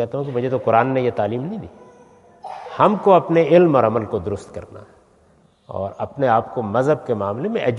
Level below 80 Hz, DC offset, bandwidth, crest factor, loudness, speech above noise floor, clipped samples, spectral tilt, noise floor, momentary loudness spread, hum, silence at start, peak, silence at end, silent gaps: -58 dBFS; under 0.1%; 10 kHz; 18 dB; -19 LUFS; 37 dB; under 0.1%; -8 dB/octave; -55 dBFS; 20 LU; none; 0 s; 0 dBFS; 0 s; none